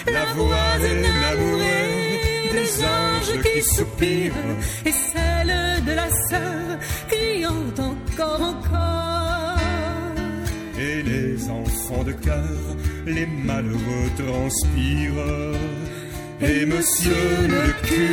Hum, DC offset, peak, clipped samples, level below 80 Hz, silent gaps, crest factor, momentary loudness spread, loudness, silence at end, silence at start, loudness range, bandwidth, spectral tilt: none; under 0.1%; -4 dBFS; under 0.1%; -30 dBFS; none; 16 dB; 8 LU; -22 LUFS; 0 s; 0 s; 5 LU; 17 kHz; -4 dB/octave